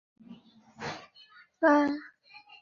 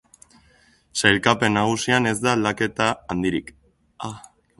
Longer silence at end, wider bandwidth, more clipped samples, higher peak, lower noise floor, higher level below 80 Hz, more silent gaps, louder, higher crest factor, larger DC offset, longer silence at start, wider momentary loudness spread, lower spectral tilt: second, 0.25 s vs 0.4 s; second, 7.2 kHz vs 12 kHz; neither; second, -12 dBFS vs 0 dBFS; about the same, -57 dBFS vs -57 dBFS; second, -72 dBFS vs -52 dBFS; neither; second, -28 LUFS vs -21 LUFS; about the same, 20 dB vs 22 dB; neither; second, 0.3 s vs 0.95 s; first, 21 LU vs 17 LU; first, -5.5 dB/octave vs -4 dB/octave